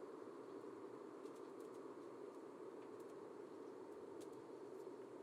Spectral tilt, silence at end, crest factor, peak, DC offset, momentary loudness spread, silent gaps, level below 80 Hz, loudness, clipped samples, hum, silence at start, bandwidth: -5.5 dB/octave; 0 s; 12 dB; -42 dBFS; under 0.1%; 1 LU; none; under -90 dBFS; -56 LUFS; under 0.1%; none; 0 s; 15 kHz